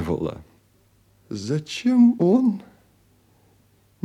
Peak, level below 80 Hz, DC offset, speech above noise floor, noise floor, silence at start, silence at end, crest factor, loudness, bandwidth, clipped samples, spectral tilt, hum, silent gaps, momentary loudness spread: -8 dBFS; -56 dBFS; under 0.1%; 40 dB; -60 dBFS; 0 s; 1.45 s; 16 dB; -21 LUFS; 9.6 kHz; under 0.1%; -7 dB/octave; none; none; 18 LU